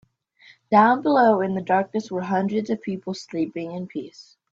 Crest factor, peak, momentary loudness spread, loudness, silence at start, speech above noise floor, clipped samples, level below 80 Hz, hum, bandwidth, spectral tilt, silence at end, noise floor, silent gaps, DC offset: 18 dB; -4 dBFS; 14 LU; -22 LUFS; 0.7 s; 32 dB; under 0.1%; -68 dBFS; none; 7.6 kHz; -7 dB/octave; 0.3 s; -54 dBFS; none; under 0.1%